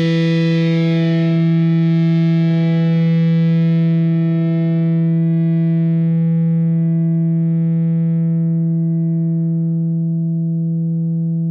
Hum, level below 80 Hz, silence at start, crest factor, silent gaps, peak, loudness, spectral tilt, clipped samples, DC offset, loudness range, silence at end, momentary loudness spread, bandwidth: none; -68 dBFS; 0 s; 6 dB; none; -8 dBFS; -16 LUFS; -10 dB/octave; under 0.1%; under 0.1%; 3 LU; 0 s; 4 LU; 5.2 kHz